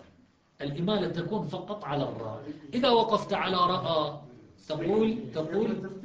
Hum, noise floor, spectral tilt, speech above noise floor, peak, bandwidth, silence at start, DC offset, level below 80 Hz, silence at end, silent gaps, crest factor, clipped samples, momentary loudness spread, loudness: none; -62 dBFS; -7 dB/octave; 33 dB; -12 dBFS; 7.8 kHz; 0.6 s; under 0.1%; -60 dBFS; 0 s; none; 18 dB; under 0.1%; 13 LU; -29 LUFS